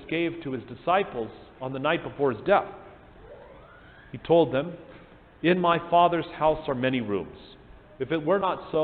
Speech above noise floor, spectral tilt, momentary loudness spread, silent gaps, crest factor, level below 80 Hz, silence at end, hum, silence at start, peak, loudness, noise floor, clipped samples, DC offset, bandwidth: 24 dB; -10 dB/octave; 17 LU; none; 20 dB; -56 dBFS; 0 s; none; 0 s; -8 dBFS; -26 LUFS; -50 dBFS; under 0.1%; under 0.1%; 4.6 kHz